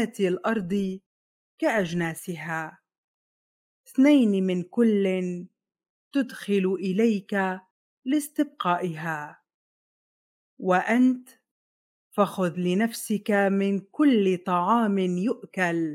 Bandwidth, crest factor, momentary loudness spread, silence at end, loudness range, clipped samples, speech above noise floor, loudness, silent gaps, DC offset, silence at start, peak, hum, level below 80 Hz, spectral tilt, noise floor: 16.5 kHz; 18 dB; 12 LU; 0 s; 5 LU; under 0.1%; over 66 dB; -25 LUFS; 1.06-1.58 s, 2.98-3.84 s, 5.89-6.11 s, 7.71-8.02 s, 9.54-10.57 s, 11.51-12.11 s; under 0.1%; 0 s; -8 dBFS; none; -72 dBFS; -6.5 dB/octave; under -90 dBFS